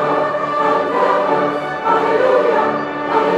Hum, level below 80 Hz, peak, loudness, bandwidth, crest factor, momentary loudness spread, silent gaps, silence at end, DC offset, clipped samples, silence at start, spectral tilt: none; -58 dBFS; -2 dBFS; -16 LUFS; 11 kHz; 12 dB; 5 LU; none; 0 s; under 0.1%; under 0.1%; 0 s; -6 dB/octave